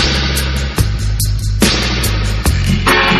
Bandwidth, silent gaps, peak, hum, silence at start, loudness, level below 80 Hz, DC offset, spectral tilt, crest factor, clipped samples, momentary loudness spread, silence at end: 13.5 kHz; none; 0 dBFS; none; 0 s; -14 LUFS; -18 dBFS; under 0.1%; -4 dB/octave; 14 dB; under 0.1%; 5 LU; 0 s